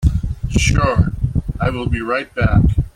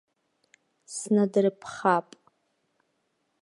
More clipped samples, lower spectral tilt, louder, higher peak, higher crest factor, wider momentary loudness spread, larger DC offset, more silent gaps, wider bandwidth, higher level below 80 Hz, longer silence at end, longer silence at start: neither; about the same, -6 dB/octave vs -5.5 dB/octave; first, -18 LUFS vs -26 LUFS; first, -2 dBFS vs -8 dBFS; second, 14 dB vs 20 dB; second, 7 LU vs 11 LU; neither; neither; about the same, 12.5 kHz vs 11.5 kHz; first, -22 dBFS vs -78 dBFS; second, 0.05 s vs 1.4 s; second, 0 s vs 0.9 s